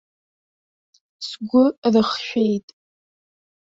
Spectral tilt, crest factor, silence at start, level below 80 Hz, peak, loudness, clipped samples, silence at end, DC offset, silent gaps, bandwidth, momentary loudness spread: -6 dB/octave; 18 dB; 1.2 s; -62 dBFS; -6 dBFS; -20 LUFS; under 0.1%; 1 s; under 0.1%; 1.78-1.82 s; 7.8 kHz; 14 LU